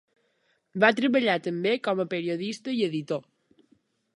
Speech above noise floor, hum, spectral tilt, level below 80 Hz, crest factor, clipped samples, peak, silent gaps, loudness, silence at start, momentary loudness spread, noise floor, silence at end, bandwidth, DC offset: 45 dB; none; -5.5 dB/octave; -78 dBFS; 22 dB; under 0.1%; -6 dBFS; none; -26 LUFS; 0.75 s; 10 LU; -71 dBFS; 0.95 s; 11 kHz; under 0.1%